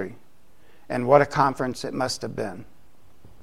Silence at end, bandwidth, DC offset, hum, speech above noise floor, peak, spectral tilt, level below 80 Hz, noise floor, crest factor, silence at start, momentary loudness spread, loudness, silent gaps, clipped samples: 0.8 s; 14 kHz; 0.7%; none; 36 dB; -2 dBFS; -5 dB/octave; -56 dBFS; -59 dBFS; 24 dB; 0 s; 15 LU; -24 LUFS; none; under 0.1%